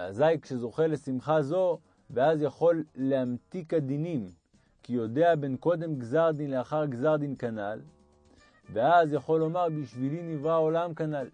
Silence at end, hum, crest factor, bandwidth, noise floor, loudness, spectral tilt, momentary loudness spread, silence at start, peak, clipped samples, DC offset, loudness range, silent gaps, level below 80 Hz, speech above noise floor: 0.05 s; none; 18 dB; 9.8 kHz; -60 dBFS; -28 LUFS; -8 dB/octave; 10 LU; 0 s; -12 dBFS; under 0.1%; under 0.1%; 2 LU; none; -70 dBFS; 33 dB